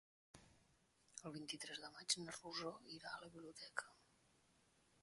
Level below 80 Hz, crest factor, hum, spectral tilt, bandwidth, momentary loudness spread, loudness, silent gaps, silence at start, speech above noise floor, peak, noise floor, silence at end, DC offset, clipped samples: -84 dBFS; 28 dB; none; -1.5 dB/octave; 11.5 kHz; 22 LU; -49 LUFS; none; 0.35 s; 27 dB; -26 dBFS; -77 dBFS; 1 s; under 0.1%; under 0.1%